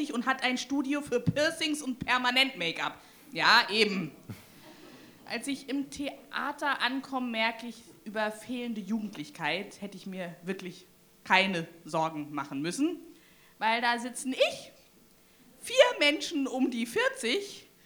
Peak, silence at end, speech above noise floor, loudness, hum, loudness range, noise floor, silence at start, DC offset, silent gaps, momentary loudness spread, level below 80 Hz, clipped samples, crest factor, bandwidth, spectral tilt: -8 dBFS; 0.2 s; 30 dB; -29 LUFS; none; 7 LU; -60 dBFS; 0 s; under 0.1%; none; 16 LU; -68 dBFS; under 0.1%; 24 dB; over 20 kHz; -3.5 dB/octave